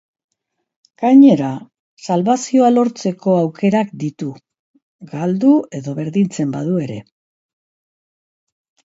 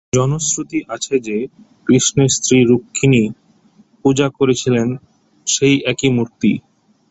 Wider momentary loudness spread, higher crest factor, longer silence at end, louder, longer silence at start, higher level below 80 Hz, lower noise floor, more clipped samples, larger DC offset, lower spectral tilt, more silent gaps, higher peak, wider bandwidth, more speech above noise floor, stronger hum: first, 17 LU vs 11 LU; about the same, 16 dB vs 16 dB; first, 1.85 s vs 0.5 s; about the same, -16 LUFS vs -16 LUFS; first, 1 s vs 0.15 s; second, -64 dBFS vs -48 dBFS; first, -75 dBFS vs -51 dBFS; neither; neither; first, -7 dB/octave vs -4.5 dB/octave; first, 1.79-1.97 s, 4.59-4.74 s, 4.82-4.99 s vs none; about the same, 0 dBFS vs 0 dBFS; about the same, 8 kHz vs 8.2 kHz; first, 60 dB vs 36 dB; neither